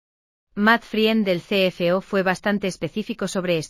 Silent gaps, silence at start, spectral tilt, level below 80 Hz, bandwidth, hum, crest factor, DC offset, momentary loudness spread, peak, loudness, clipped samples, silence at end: none; 0.55 s; -5 dB/octave; -56 dBFS; 15.5 kHz; none; 18 dB; under 0.1%; 9 LU; -4 dBFS; -21 LUFS; under 0.1%; 0 s